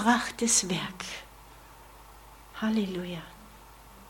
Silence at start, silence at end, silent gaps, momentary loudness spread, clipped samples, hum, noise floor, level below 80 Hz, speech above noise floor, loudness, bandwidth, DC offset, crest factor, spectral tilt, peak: 0 s; 0 s; none; 27 LU; under 0.1%; none; -51 dBFS; -56 dBFS; 22 dB; -28 LUFS; 17.5 kHz; under 0.1%; 22 dB; -2.5 dB/octave; -10 dBFS